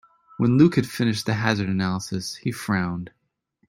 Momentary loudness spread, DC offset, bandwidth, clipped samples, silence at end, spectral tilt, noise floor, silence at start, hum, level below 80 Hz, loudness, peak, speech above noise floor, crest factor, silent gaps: 12 LU; under 0.1%; 16 kHz; under 0.1%; 0.6 s; -6 dB/octave; -69 dBFS; 0.4 s; none; -58 dBFS; -23 LUFS; -4 dBFS; 47 dB; 20 dB; none